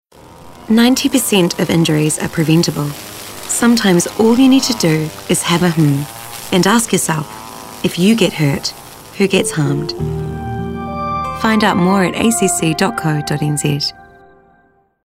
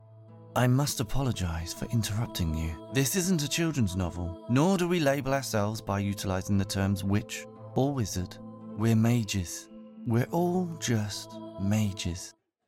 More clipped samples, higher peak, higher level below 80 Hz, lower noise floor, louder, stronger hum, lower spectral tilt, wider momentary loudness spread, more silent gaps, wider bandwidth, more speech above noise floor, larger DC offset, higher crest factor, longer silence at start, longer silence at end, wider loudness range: neither; first, 0 dBFS vs -10 dBFS; about the same, -42 dBFS vs -46 dBFS; first, -54 dBFS vs -50 dBFS; first, -14 LUFS vs -29 LUFS; neither; about the same, -4.5 dB/octave vs -5.5 dB/octave; about the same, 11 LU vs 12 LU; neither; about the same, 16.5 kHz vs 16.5 kHz; first, 41 dB vs 22 dB; neither; about the same, 14 dB vs 18 dB; first, 0.3 s vs 0.1 s; first, 1.05 s vs 0.35 s; about the same, 3 LU vs 3 LU